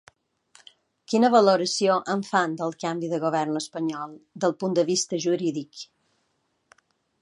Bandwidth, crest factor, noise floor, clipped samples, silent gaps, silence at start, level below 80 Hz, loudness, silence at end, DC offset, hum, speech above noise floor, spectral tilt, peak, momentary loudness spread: 11.5 kHz; 22 dB; -73 dBFS; under 0.1%; none; 1.1 s; -78 dBFS; -24 LUFS; 1.4 s; under 0.1%; none; 49 dB; -4.5 dB/octave; -4 dBFS; 16 LU